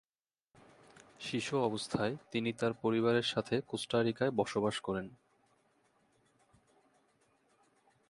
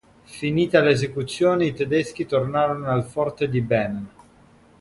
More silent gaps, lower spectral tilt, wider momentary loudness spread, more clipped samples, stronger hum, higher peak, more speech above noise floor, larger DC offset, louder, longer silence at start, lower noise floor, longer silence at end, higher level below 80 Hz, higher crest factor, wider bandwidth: neither; second, -5 dB/octave vs -6.5 dB/octave; about the same, 9 LU vs 11 LU; neither; neither; second, -16 dBFS vs -4 dBFS; first, over 56 dB vs 31 dB; neither; second, -34 LUFS vs -22 LUFS; first, 1.2 s vs 0.3 s; first, under -90 dBFS vs -53 dBFS; first, 2.95 s vs 0.7 s; second, -70 dBFS vs -54 dBFS; about the same, 20 dB vs 20 dB; about the same, 11.5 kHz vs 11.5 kHz